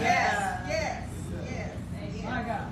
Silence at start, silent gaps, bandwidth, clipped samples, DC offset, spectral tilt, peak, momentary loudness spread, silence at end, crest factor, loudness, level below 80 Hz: 0 s; none; 14 kHz; under 0.1%; under 0.1%; -5 dB/octave; -12 dBFS; 12 LU; 0 s; 18 dB; -31 LUFS; -46 dBFS